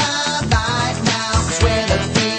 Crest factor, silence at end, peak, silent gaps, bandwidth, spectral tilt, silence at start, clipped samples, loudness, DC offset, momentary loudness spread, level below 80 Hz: 14 dB; 0 s; -2 dBFS; none; 8.8 kHz; -4 dB/octave; 0 s; under 0.1%; -17 LUFS; under 0.1%; 2 LU; -28 dBFS